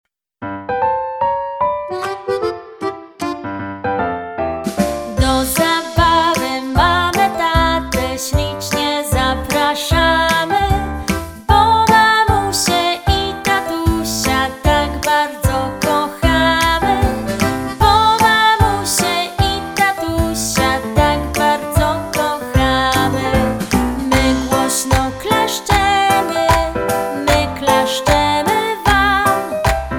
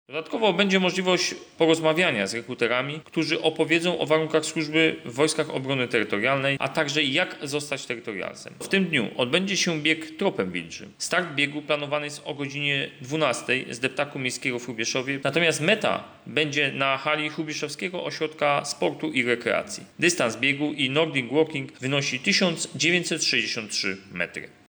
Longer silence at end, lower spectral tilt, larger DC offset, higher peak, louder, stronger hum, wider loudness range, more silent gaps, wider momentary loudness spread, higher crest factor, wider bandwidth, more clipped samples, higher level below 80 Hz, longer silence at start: second, 0 s vs 0.2 s; about the same, -4 dB/octave vs -3.5 dB/octave; neither; first, 0 dBFS vs -8 dBFS; first, -15 LUFS vs -24 LUFS; neither; first, 6 LU vs 3 LU; neither; about the same, 8 LU vs 8 LU; about the same, 16 dB vs 18 dB; about the same, over 20 kHz vs over 20 kHz; neither; first, -26 dBFS vs -70 dBFS; first, 0.4 s vs 0.1 s